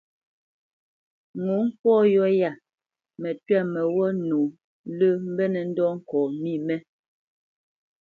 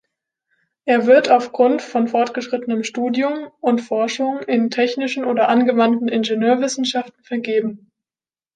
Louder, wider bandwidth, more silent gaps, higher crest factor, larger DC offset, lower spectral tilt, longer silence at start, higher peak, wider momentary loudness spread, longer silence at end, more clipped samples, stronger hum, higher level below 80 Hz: second, -24 LUFS vs -18 LUFS; second, 4.6 kHz vs 9.2 kHz; first, 1.79-1.84 s, 4.64-4.84 s vs none; about the same, 16 dB vs 16 dB; neither; first, -9.5 dB/octave vs -4.5 dB/octave; first, 1.35 s vs 0.85 s; second, -10 dBFS vs -2 dBFS; first, 13 LU vs 9 LU; first, 1.2 s vs 0.8 s; neither; neither; about the same, -74 dBFS vs -72 dBFS